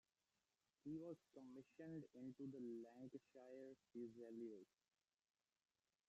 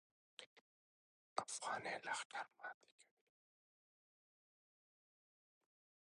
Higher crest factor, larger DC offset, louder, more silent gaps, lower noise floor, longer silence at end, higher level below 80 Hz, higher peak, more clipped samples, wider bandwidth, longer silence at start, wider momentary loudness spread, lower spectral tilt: second, 16 dB vs 30 dB; neither; second, -58 LUFS vs -47 LUFS; second, none vs 0.46-1.36 s, 2.25-2.30 s, 2.74-2.81 s, 2.92-2.98 s; about the same, under -90 dBFS vs under -90 dBFS; second, 1.45 s vs 3.1 s; about the same, under -90 dBFS vs under -90 dBFS; second, -44 dBFS vs -24 dBFS; neither; second, 8 kHz vs 10.5 kHz; first, 0.85 s vs 0.4 s; second, 8 LU vs 17 LU; first, -8.5 dB/octave vs -1 dB/octave